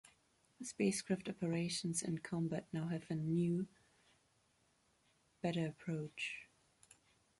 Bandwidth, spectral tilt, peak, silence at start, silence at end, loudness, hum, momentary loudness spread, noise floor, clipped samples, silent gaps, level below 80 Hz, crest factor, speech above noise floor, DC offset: 11.5 kHz; -5 dB/octave; -24 dBFS; 0.6 s; 0.95 s; -41 LUFS; none; 7 LU; -77 dBFS; under 0.1%; none; -76 dBFS; 18 dB; 37 dB; under 0.1%